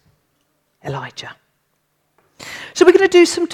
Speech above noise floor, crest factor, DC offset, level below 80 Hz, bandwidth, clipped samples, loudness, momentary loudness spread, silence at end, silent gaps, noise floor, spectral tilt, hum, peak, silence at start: 53 dB; 18 dB; under 0.1%; -60 dBFS; 12.5 kHz; under 0.1%; -13 LUFS; 24 LU; 0 s; none; -67 dBFS; -4 dB/octave; none; 0 dBFS; 0.85 s